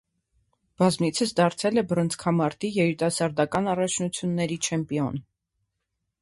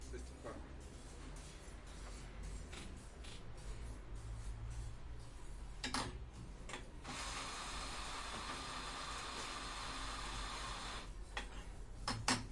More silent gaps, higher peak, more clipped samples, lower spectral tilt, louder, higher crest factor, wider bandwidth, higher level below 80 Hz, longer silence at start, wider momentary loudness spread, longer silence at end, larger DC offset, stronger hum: neither; first, -8 dBFS vs -20 dBFS; neither; first, -5 dB/octave vs -3 dB/octave; first, -25 LUFS vs -47 LUFS; second, 18 dB vs 26 dB; about the same, 11.5 kHz vs 11.5 kHz; second, -60 dBFS vs -52 dBFS; first, 0.8 s vs 0 s; second, 5 LU vs 11 LU; first, 1 s vs 0 s; neither; neither